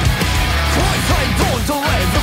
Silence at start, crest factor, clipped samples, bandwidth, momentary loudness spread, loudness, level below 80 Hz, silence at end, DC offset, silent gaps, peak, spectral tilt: 0 s; 14 dB; under 0.1%; 16 kHz; 1 LU; -16 LUFS; -22 dBFS; 0 s; under 0.1%; none; 0 dBFS; -4.5 dB/octave